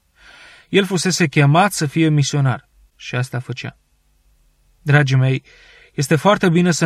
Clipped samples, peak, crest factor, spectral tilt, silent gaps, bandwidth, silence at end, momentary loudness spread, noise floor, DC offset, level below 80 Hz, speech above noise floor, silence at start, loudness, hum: under 0.1%; -2 dBFS; 16 dB; -5.5 dB/octave; none; 14.5 kHz; 0 s; 15 LU; -59 dBFS; under 0.1%; -54 dBFS; 43 dB; 0.7 s; -17 LUFS; none